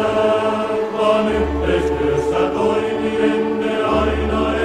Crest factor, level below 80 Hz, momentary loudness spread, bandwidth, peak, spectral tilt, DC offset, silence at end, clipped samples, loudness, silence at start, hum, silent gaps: 14 dB; -32 dBFS; 3 LU; 11 kHz; -4 dBFS; -6.5 dB/octave; under 0.1%; 0 s; under 0.1%; -18 LUFS; 0 s; none; none